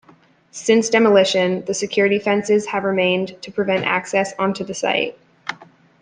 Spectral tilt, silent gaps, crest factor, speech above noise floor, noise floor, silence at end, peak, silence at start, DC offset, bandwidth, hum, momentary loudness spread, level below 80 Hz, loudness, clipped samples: -4 dB/octave; none; 18 dB; 34 dB; -52 dBFS; 0.4 s; -2 dBFS; 0.55 s; under 0.1%; 10 kHz; none; 12 LU; -64 dBFS; -18 LUFS; under 0.1%